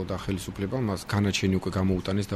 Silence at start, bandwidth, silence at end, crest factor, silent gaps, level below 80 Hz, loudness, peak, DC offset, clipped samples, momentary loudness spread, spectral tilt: 0 s; 15 kHz; 0 s; 16 dB; none; -48 dBFS; -28 LUFS; -10 dBFS; under 0.1%; under 0.1%; 7 LU; -6 dB/octave